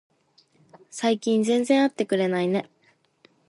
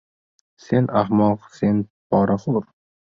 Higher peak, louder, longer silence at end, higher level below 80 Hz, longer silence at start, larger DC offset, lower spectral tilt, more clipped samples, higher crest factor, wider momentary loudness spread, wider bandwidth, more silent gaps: second, -8 dBFS vs -4 dBFS; about the same, -23 LUFS vs -21 LUFS; first, 0.85 s vs 0.45 s; second, -76 dBFS vs -52 dBFS; first, 0.95 s vs 0.7 s; neither; second, -5 dB/octave vs -9 dB/octave; neither; about the same, 18 dB vs 16 dB; about the same, 7 LU vs 6 LU; first, 11.5 kHz vs 7.2 kHz; second, none vs 1.90-2.10 s